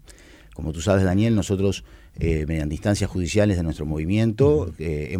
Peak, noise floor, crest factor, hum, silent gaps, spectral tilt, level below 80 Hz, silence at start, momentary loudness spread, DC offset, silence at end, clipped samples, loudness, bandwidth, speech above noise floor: -6 dBFS; -47 dBFS; 16 dB; none; none; -6.5 dB/octave; -36 dBFS; 0.1 s; 9 LU; under 0.1%; 0 s; under 0.1%; -22 LUFS; 15 kHz; 25 dB